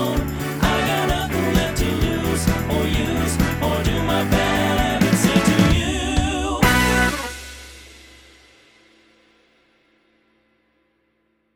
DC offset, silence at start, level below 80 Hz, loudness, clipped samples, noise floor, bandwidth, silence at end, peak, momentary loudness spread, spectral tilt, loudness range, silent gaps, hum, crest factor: under 0.1%; 0 s; -30 dBFS; -19 LUFS; under 0.1%; -67 dBFS; over 20 kHz; 3.6 s; 0 dBFS; 7 LU; -5 dB/octave; 5 LU; none; none; 20 dB